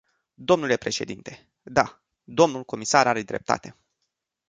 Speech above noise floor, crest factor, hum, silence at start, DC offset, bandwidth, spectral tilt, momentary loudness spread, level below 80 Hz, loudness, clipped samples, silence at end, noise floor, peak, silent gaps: 56 dB; 24 dB; none; 0.4 s; under 0.1%; 9.6 kHz; -4 dB/octave; 14 LU; -60 dBFS; -24 LUFS; under 0.1%; 0.8 s; -80 dBFS; -2 dBFS; none